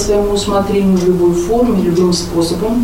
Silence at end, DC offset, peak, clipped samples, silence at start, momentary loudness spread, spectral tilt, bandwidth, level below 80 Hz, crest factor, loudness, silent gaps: 0 s; under 0.1%; -2 dBFS; under 0.1%; 0 s; 3 LU; -6 dB/octave; 16.5 kHz; -28 dBFS; 10 dB; -13 LUFS; none